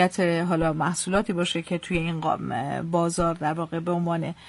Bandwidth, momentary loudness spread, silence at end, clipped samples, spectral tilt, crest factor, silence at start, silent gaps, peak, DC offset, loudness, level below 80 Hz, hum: 11.5 kHz; 5 LU; 0 s; under 0.1%; -5.5 dB/octave; 18 dB; 0 s; none; -8 dBFS; under 0.1%; -26 LUFS; -46 dBFS; none